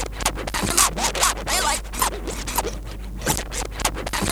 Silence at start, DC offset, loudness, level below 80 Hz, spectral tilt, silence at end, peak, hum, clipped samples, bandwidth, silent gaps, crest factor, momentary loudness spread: 0 s; under 0.1%; -22 LUFS; -32 dBFS; -2 dB/octave; 0 s; 0 dBFS; none; under 0.1%; over 20 kHz; none; 24 dB; 11 LU